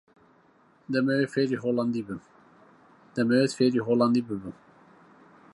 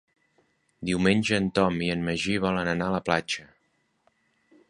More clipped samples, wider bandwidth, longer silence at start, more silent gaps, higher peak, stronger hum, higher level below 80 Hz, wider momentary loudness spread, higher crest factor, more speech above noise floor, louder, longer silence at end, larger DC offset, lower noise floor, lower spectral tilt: neither; about the same, 11.5 kHz vs 11 kHz; about the same, 0.9 s vs 0.8 s; neither; second, -10 dBFS vs -4 dBFS; neither; second, -68 dBFS vs -52 dBFS; first, 14 LU vs 8 LU; second, 18 dB vs 24 dB; second, 36 dB vs 46 dB; about the same, -26 LUFS vs -26 LUFS; second, 1.05 s vs 1.25 s; neither; second, -61 dBFS vs -71 dBFS; about the same, -6.5 dB/octave vs -5.5 dB/octave